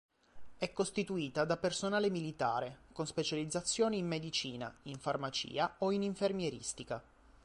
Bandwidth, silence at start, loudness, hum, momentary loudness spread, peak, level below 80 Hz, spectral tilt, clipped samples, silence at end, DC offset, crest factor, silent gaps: 11.5 kHz; 0.35 s; -37 LUFS; none; 9 LU; -20 dBFS; -66 dBFS; -4 dB/octave; under 0.1%; 0.45 s; under 0.1%; 18 dB; none